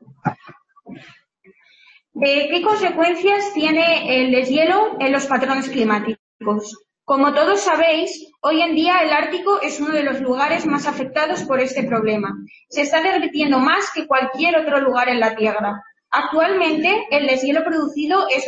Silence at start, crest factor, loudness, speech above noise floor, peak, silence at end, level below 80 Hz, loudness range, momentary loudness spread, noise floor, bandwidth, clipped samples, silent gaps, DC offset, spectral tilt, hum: 0.25 s; 14 dB; -18 LUFS; 36 dB; -6 dBFS; 0 s; -62 dBFS; 3 LU; 8 LU; -54 dBFS; 8.6 kHz; under 0.1%; 6.19-6.40 s; under 0.1%; -4 dB/octave; none